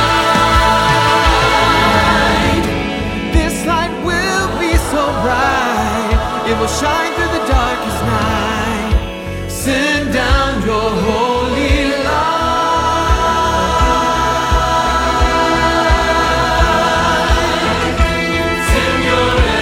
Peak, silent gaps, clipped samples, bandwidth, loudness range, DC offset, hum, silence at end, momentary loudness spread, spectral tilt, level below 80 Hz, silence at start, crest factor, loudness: 0 dBFS; none; under 0.1%; 17 kHz; 3 LU; under 0.1%; none; 0 s; 6 LU; -4.5 dB/octave; -22 dBFS; 0 s; 12 dB; -14 LUFS